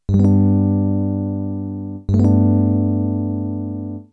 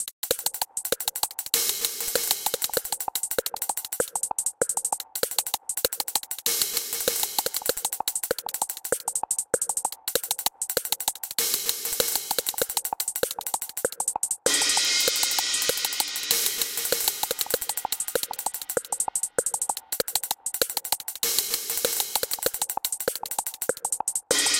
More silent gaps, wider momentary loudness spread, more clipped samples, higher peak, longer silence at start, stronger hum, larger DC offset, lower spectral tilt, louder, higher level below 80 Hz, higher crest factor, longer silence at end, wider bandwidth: second, none vs 0.12-0.23 s; first, 12 LU vs 6 LU; neither; about the same, -4 dBFS vs -2 dBFS; about the same, 0.1 s vs 0 s; first, 50 Hz at -40 dBFS vs none; neither; first, -12 dB/octave vs 1 dB/octave; first, -18 LUFS vs -25 LUFS; first, -40 dBFS vs -60 dBFS; second, 14 dB vs 26 dB; about the same, 0.1 s vs 0 s; second, 4.1 kHz vs 17.5 kHz